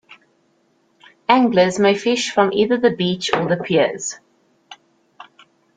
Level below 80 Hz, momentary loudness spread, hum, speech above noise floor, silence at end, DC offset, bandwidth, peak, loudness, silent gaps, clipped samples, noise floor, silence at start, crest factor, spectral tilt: -60 dBFS; 11 LU; none; 45 dB; 1.05 s; under 0.1%; 9.6 kHz; -2 dBFS; -17 LUFS; none; under 0.1%; -61 dBFS; 0.1 s; 18 dB; -4.5 dB/octave